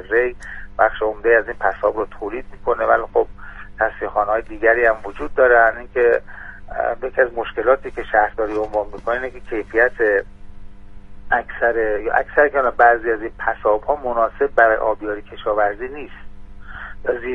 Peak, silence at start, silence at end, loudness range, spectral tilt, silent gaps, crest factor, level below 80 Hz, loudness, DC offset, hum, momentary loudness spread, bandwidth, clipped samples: 0 dBFS; 0 s; 0 s; 3 LU; -6.5 dB/octave; none; 18 dB; -38 dBFS; -19 LUFS; under 0.1%; 50 Hz at -55 dBFS; 13 LU; 6.4 kHz; under 0.1%